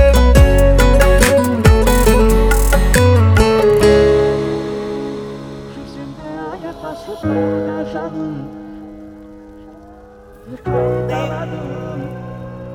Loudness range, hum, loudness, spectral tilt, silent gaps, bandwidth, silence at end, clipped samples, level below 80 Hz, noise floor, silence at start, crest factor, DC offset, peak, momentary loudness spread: 13 LU; none; -14 LUFS; -6 dB/octave; none; 19.5 kHz; 0 s; under 0.1%; -18 dBFS; -39 dBFS; 0 s; 14 dB; under 0.1%; 0 dBFS; 20 LU